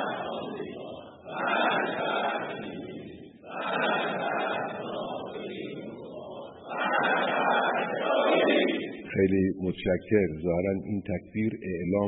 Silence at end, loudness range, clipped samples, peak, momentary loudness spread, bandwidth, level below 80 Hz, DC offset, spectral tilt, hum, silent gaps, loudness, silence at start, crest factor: 0 s; 6 LU; under 0.1%; -10 dBFS; 16 LU; 4.1 kHz; -60 dBFS; under 0.1%; -10 dB/octave; none; none; -28 LUFS; 0 s; 18 dB